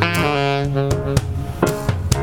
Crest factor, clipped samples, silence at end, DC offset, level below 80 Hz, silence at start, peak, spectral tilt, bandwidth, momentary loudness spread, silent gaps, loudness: 18 dB; under 0.1%; 0 s; 0.7%; -32 dBFS; 0 s; 0 dBFS; -5.5 dB/octave; 19 kHz; 4 LU; none; -20 LUFS